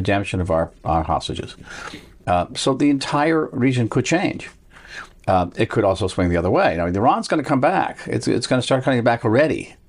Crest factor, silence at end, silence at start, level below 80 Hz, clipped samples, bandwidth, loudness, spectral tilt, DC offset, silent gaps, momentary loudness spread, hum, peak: 14 dB; 0.15 s; 0 s; -42 dBFS; under 0.1%; 11.5 kHz; -20 LUFS; -6 dB/octave; under 0.1%; none; 15 LU; none; -6 dBFS